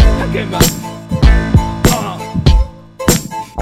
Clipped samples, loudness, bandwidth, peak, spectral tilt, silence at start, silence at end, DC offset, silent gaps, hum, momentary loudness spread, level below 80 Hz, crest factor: 0.1%; -14 LUFS; 16.5 kHz; 0 dBFS; -5 dB/octave; 0 s; 0 s; under 0.1%; none; none; 9 LU; -16 dBFS; 12 dB